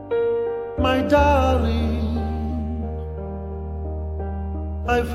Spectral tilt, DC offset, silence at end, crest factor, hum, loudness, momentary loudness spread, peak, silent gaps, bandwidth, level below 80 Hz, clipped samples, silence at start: -7.5 dB/octave; under 0.1%; 0 s; 18 dB; none; -23 LUFS; 14 LU; -4 dBFS; none; 12 kHz; -28 dBFS; under 0.1%; 0 s